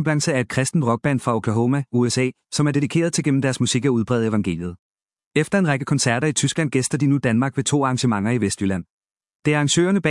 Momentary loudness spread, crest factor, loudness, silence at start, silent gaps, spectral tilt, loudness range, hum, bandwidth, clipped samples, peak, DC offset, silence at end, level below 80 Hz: 5 LU; 18 dB; -20 LUFS; 0 s; 4.79-4.95 s, 5.26-5.31 s, 8.90-9.01 s, 9.11-9.15 s, 9.35-9.43 s; -5 dB/octave; 1 LU; none; 12 kHz; under 0.1%; -4 dBFS; under 0.1%; 0 s; -58 dBFS